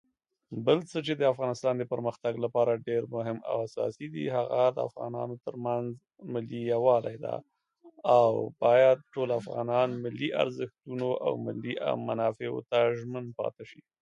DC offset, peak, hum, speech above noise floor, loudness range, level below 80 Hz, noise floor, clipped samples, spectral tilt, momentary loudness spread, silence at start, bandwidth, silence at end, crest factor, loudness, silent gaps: under 0.1%; -10 dBFS; none; 29 dB; 5 LU; -74 dBFS; -58 dBFS; under 0.1%; -7 dB/octave; 12 LU; 0.5 s; 9.4 kHz; 0.3 s; 20 dB; -29 LUFS; none